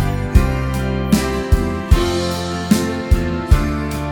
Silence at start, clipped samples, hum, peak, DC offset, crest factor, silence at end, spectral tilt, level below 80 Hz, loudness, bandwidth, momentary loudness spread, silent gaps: 0 s; under 0.1%; none; 0 dBFS; under 0.1%; 16 dB; 0 s; -6 dB/octave; -20 dBFS; -18 LUFS; 18.5 kHz; 4 LU; none